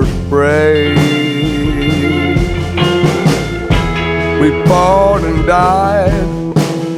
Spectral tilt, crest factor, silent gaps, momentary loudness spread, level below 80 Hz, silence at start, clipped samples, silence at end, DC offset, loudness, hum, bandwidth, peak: -6.5 dB/octave; 12 dB; none; 5 LU; -24 dBFS; 0 s; under 0.1%; 0 s; under 0.1%; -12 LUFS; none; 15 kHz; 0 dBFS